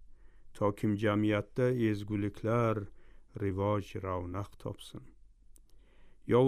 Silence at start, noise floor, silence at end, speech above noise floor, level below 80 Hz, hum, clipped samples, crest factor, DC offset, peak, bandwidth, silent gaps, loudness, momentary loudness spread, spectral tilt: 0 s; -57 dBFS; 0 s; 24 dB; -58 dBFS; none; under 0.1%; 18 dB; under 0.1%; -16 dBFS; 14 kHz; none; -33 LUFS; 17 LU; -8 dB/octave